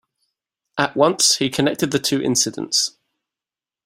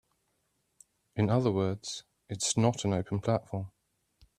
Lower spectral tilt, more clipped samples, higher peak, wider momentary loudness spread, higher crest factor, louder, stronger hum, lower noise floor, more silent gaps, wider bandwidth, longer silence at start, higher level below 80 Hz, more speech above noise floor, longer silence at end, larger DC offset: second, -2.5 dB/octave vs -5.5 dB/octave; neither; first, -2 dBFS vs -12 dBFS; second, 8 LU vs 15 LU; about the same, 20 dB vs 20 dB; first, -18 LUFS vs -31 LUFS; neither; first, under -90 dBFS vs -77 dBFS; neither; first, 16 kHz vs 13.5 kHz; second, 0.75 s vs 1.15 s; about the same, -60 dBFS vs -64 dBFS; first, over 71 dB vs 47 dB; first, 0.95 s vs 0.7 s; neither